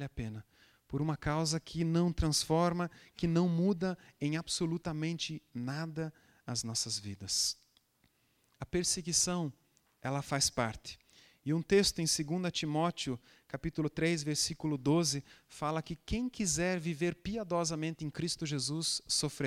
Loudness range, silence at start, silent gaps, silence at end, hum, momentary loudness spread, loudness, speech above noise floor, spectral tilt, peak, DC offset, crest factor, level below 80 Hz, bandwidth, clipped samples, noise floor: 4 LU; 0 s; none; 0 s; none; 12 LU; -34 LUFS; 39 dB; -4 dB/octave; -16 dBFS; under 0.1%; 18 dB; -54 dBFS; 15.5 kHz; under 0.1%; -73 dBFS